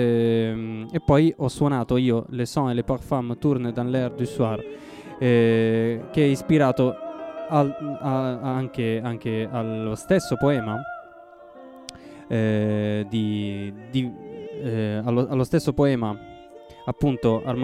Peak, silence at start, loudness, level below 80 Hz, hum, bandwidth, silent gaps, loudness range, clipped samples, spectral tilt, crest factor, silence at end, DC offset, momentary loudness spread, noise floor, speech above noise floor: -4 dBFS; 0 s; -24 LUFS; -50 dBFS; none; 15 kHz; none; 5 LU; under 0.1%; -7.5 dB/octave; 18 dB; 0 s; under 0.1%; 14 LU; -46 dBFS; 23 dB